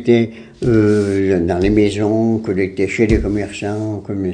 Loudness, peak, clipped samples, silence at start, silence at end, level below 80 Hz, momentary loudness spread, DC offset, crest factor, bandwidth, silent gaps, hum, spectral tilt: -16 LUFS; 0 dBFS; under 0.1%; 0 s; 0 s; -32 dBFS; 8 LU; under 0.1%; 16 dB; 10 kHz; none; none; -7.5 dB/octave